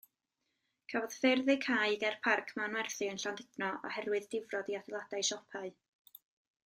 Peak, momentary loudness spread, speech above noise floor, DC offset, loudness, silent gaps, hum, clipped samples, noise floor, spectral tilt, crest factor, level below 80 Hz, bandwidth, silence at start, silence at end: -16 dBFS; 11 LU; 50 dB; under 0.1%; -35 LUFS; none; none; under 0.1%; -85 dBFS; -2 dB/octave; 20 dB; -84 dBFS; 15.5 kHz; 0.9 s; 0.95 s